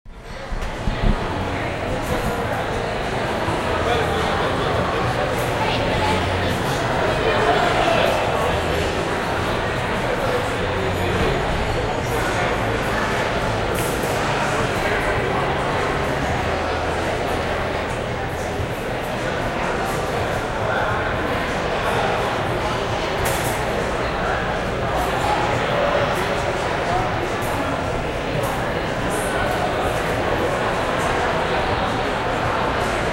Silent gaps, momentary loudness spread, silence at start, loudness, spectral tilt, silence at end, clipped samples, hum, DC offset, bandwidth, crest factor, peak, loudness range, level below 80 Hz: none; 4 LU; 0.05 s; -21 LUFS; -5 dB/octave; 0 s; under 0.1%; none; under 0.1%; 16 kHz; 18 dB; -4 dBFS; 3 LU; -32 dBFS